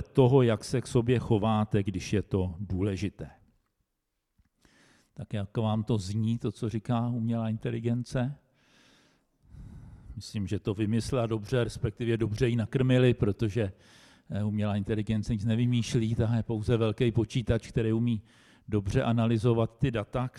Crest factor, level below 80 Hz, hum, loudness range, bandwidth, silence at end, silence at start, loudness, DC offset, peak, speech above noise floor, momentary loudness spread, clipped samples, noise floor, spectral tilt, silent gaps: 18 dB; -50 dBFS; none; 7 LU; 11.5 kHz; 0 s; 0 s; -29 LUFS; under 0.1%; -10 dBFS; 54 dB; 10 LU; under 0.1%; -82 dBFS; -7.5 dB/octave; none